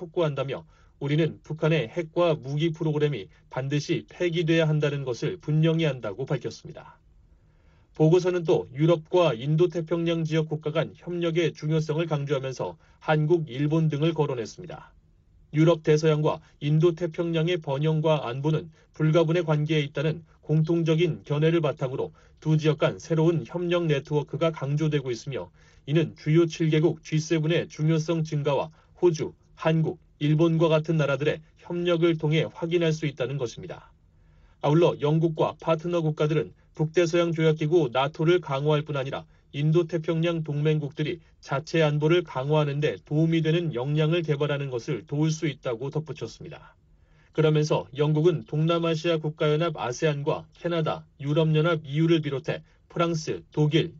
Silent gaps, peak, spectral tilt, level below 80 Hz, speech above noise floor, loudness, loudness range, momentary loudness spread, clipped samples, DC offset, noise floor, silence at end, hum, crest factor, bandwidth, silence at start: none; -10 dBFS; -6.5 dB/octave; -60 dBFS; 33 dB; -25 LUFS; 3 LU; 10 LU; under 0.1%; under 0.1%; -58 dBFS; 0 s; none; 16 dB; 7.2 kHz; 0 s